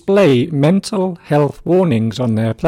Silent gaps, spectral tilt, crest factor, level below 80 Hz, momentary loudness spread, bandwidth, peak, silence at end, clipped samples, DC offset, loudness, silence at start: none; -7.5 dB/octave; 14 dB; -48 dBFS; 6 LU; 14.5 kHz; 0 dBFS; 0 s; under 0.1%; under 0.1%; -15 LUFS; 0.05 s